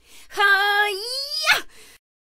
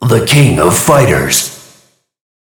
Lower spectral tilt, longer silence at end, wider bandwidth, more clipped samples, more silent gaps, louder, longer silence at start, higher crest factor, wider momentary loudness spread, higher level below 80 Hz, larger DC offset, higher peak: second, 1 dB/octave vs -4.5 dB/octave; second, 0.45 s vs 0.85 s; second, 16 kHz vs 19.5 kHz; second, under 0.1% vs 0.6%; neither; second, -19 LUFS vs -9 LUFS; first, 0.15 s vs 0 s; first, 20 dB vs 10 dB; first, 9 LU vs 5 LU; second, -62 dBFS vs -34 dBFS; neither; about the same, -2 dBFS vs 0 dBFS